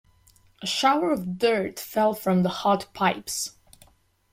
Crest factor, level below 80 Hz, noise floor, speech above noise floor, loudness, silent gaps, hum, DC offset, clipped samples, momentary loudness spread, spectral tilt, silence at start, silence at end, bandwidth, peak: 18 dB; -62 dBFS; -60 dBFS; 36 dB; -25 LUFS; none; none; under 0.1%; under 0.1%; 8 LU; -4.5 dB/octave; 0.6 s; 0.85 s; 16.5 kHz; -8 dBFS